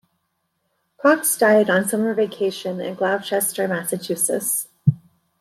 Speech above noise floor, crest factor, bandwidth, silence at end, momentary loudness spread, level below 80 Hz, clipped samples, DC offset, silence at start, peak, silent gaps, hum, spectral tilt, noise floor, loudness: 52 dB; 18 dB; 16.5 kHz; 0.45 s; 9 LU; -68 dBFS; under 0.1%; under 0.1%; 1.05 s; -4 dBFS; none; none; -4.5 dB/octave; -72 dBFS; -20 LUFS